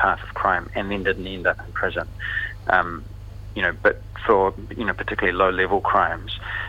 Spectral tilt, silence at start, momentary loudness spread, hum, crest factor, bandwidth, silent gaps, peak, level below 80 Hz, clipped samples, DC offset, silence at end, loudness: -6.5 dB/octave; 0 s; 9 LU; 50 Hz at -40 dBFS; 22 dB; 16 kHz; none; -2 dBFS; -40 dBFS; under 0.1%; under 0.1%; 0 s; -22 LUFS